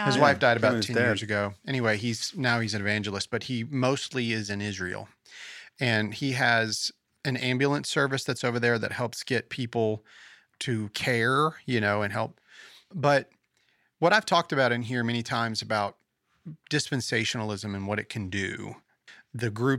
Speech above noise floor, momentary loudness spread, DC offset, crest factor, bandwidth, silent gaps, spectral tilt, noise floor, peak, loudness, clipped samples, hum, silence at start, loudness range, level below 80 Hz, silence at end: 43 dB; 11 LU; under 0.1%; 24 dB; 14.5 kHz; none; -4.5 dB/octave; -70 dBFS; -4 dBFS; -27 LUFS; under 0.1%; none; 0 s; 4 LU; -68 dBFS; 0 s